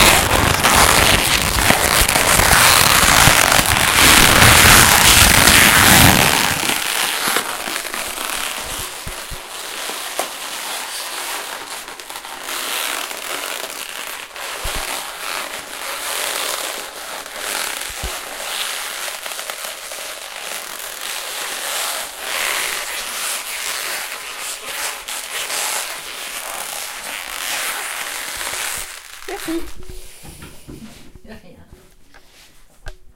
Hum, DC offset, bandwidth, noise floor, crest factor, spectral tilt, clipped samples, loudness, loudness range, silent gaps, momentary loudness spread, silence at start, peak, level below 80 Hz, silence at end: none; under 0.1%; over 20 kHz; -45 dBFS; 18 dB; -1.5 dB/octave; under 0.1%; -15 LUFS; 16 LU; none; 19 LU; 0 s; 0 dBFS; -32 dBFS; 0.05 s